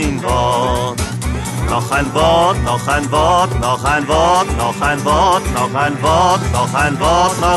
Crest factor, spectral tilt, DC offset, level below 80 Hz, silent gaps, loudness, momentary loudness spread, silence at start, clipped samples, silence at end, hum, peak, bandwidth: 14 dB; -4.5 dB/octave; under 0.1%; -26 dBFS; none; -14 LUFS; 6 LU; 0 s; under 0.1%; 0 s; none; 0 dBFS; 12.5 kHz